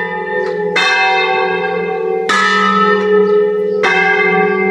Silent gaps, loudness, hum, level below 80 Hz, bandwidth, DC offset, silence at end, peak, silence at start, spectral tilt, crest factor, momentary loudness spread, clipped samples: none; -12 LUFS; none; -62 dBFS; 10.5 kHz; under 0.1%; 0 s; 0 dBFS; 0 s; -4.5 dB/octave; 12 dB; 7 LU; under 0.1%